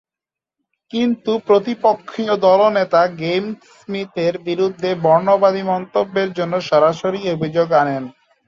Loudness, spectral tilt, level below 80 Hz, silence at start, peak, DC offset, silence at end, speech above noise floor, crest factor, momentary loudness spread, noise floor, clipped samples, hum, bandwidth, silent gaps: -17 LUFS; -6.5 dB/octave; -62 dBFS; 0.95 s; -2 dBFS; under 0.1%; 0.4 s; 71 dB; 16 dB; 10 LU; -88 dBFS; under 0.1%; none; 7.4 kHz; none